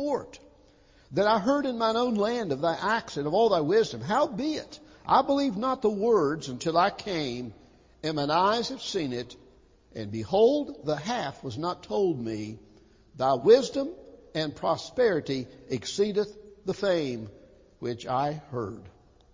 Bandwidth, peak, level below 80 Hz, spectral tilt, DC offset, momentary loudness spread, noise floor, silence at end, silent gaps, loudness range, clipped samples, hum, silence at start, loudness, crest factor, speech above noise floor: 7.6 kHz; -8 dBFS; -60 dBFS; -5.5 dB/octave; under 0.1%; 13 LU; -58 dBFS; 0.45 s; none; 5 LU; under 0.1%; none; 0 s; -27 LUFS; 20 dB; 31 dB